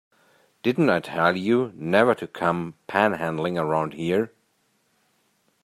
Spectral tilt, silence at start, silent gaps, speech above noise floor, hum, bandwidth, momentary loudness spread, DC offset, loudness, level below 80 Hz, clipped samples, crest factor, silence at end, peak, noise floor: -7 dB/octave; 0.65 s; none; 45 dB; none; 14 kHz; 6 LU; under 0.1%; -23 LUFS; -66 dBFS; under 0.1%; 22 dB; 1.35 s; -4 dBFS; -68 dBFS